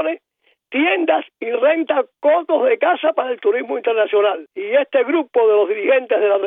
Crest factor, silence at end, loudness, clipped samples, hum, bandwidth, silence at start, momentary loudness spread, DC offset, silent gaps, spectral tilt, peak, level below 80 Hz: 14 dB; 0 s; -17 LUFS; under 0.1%; none; 3.9 kHz; 0 s; 5 LU; under 0.1%; none; -6.5 dB/octave; -4 dBFS; under -90 dBFS